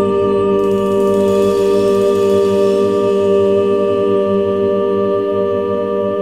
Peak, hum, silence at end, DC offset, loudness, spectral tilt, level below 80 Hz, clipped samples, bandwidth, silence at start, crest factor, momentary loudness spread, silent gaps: -2 dBFS; none; 0 s; 0.4%; -14 LUFS; -7 dB/octave; -48 dBFS; under 0.1%; 13.5 kHz; 0 s; 10 dB; 3 LU; none